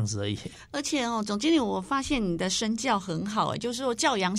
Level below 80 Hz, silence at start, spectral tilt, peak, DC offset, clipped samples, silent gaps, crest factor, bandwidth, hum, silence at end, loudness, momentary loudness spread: -52 dBFS; 0 s; -4 dB/octave; -10 dBFS; under 0.1%; under 0.1%; none; 18 dB; 14.5 kHz; none; 0 s; -28 LUFS; 7 LU